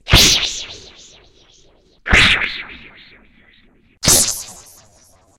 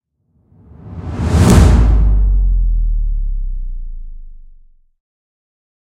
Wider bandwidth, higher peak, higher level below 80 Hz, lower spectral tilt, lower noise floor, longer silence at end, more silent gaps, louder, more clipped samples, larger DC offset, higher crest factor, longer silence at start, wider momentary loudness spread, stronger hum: first, 16.5 kHz vs 12.5 kHz; about the same, 0 dBFS vs 0 dBFS; second, -28 dBFS vs -16 dBFS; second, -1.5 dB/octave vs -7 dB/octave; second, -52 dBFS vs -59 dBFS; second, 0.85 s vs 1.6 s; neither; about the same, -13 LUFS vs -14 LUFS; neither; neither; about the same, 18 dB vs 14 dB; second, 0.05 s vs 0.85 s; about the same, 23 LU vs 23 LU; neither